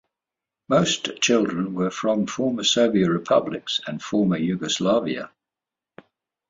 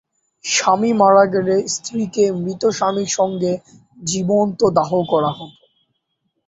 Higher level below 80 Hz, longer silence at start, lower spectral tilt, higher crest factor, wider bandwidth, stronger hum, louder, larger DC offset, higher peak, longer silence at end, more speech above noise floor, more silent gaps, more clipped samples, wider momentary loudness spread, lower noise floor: about the same, -62 dBFS vs -58 dBFS; first, 0.7 s vs 0.45 s; about the same, -4.5 dB/octave vs -4.5 dB/octave; about the same, 18 dB vs 16 dB; about the same, 7.8 kHz vs 8.2 kHz; neither; second, -22 LUFS vs -17 LUFS; neither; second, -6 dBFS vs -2 dBFS; first, 1.25 s vs 1 s; first, 66 dB vs 54 dB; neither; neither; second, 7 LU vs 10 LU; first, -88 dBFS vs -71 dBFS